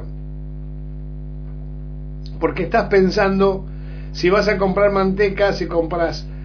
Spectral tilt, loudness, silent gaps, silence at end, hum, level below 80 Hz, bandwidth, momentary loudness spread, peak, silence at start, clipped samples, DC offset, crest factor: -6.5 dB/octave; -18 LUFS; none; 0 s; 50 Hz at -30 dBFS; -32 dBFS; 5.4 kHz; 17 LU; -2 dBFS; 0 s; under 0.1%; under 0.1%; 18 dB